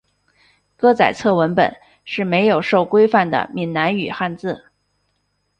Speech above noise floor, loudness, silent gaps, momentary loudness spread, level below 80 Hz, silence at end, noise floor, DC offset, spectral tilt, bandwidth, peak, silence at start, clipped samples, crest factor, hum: 52 dB; -17 LUFS; none; 10 LU; -58 dBFS; 1 s; -68 dBFS; under 0.1%; -6.5 dB/octave; 9 kHz; -2 dBFS; 0.8 s; under 0.1%; 18 dB; 50 Hz at -55 dBFS